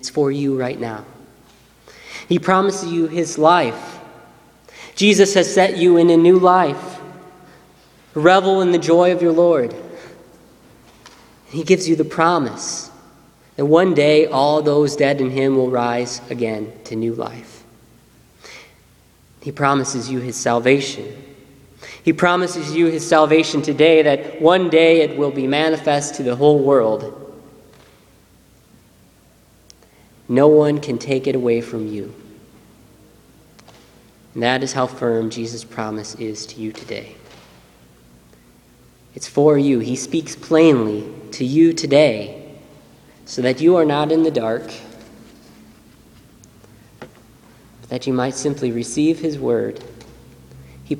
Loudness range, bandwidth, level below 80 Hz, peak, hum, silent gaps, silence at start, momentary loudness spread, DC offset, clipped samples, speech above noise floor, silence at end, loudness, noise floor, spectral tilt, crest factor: 12 LU; 13 kHz; -58 dBFS; 0 dBFS; none; none; 0.05 s; 18 LU; under 0.1%; under 0.1%; 35 dB; 0 s; -17 LUFS; -52 dBFS; -5 dB/octave; 18 dB